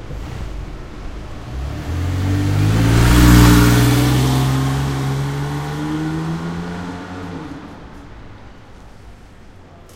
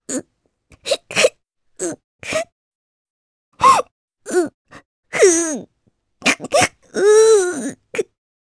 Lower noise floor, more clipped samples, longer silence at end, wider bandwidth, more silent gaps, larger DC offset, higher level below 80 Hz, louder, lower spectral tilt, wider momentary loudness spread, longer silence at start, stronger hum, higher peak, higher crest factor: second, -40 dBFS vs -64 dBFS; neither; second, 0.1 s vs 0.45 s; first, 16 kHz vs 11 kHz; second, none vs 2.04-2.19 s, 2.52-3.52 s, 3.91-4.08 s, 4.54-4.65 s, 4.85-5.03 s; neither; first, -24 dBFS vs -58 dBFS; about the same, -16 LUFS vs -17 LUFS; first, -6 dB/octave vs -2 dB/octave; first, 23 LU vs 14 LU; about the same, 0 s vs 0.1 s; neither; about the same, 0 dBFS vs 0 dBFS; about the same, 18 dB vs 18 dB